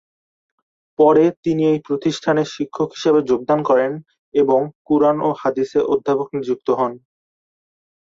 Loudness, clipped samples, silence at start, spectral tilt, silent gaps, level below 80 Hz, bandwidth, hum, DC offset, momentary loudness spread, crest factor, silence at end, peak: -18 LUFS; under 0.1%; 1 s; -6.5 dB/octave; 1.37-1.43 s, 4.18-4.32 s, 4.75-4.85 s; -62 dBFS; 7.6 kHz; none; under 0.1%; 8 LU; 16 dB; 1.15 s; -2 dBFS